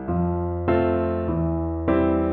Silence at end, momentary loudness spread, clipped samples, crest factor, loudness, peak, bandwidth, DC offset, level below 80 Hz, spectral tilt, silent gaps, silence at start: 0 s; 4 LU; under 0.1%; 14 dB; -23 LUFS; -8 dBFS; 4.3 kHz; under 0.1%; -36 dBFS; -12 dB/octave; none; 0 s